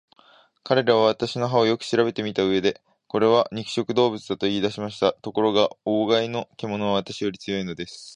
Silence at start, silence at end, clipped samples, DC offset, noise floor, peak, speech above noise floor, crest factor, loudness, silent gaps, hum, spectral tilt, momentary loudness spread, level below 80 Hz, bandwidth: 0.65 s; 0 s; under 0.1%; under 0.1%; -56 dBFS; -4 dBFS; 33 dB; 20 dB; -23 LUFS; none; none; -5.5 dB/octave; 9 LU; -60 dBFS; 10.5 kHz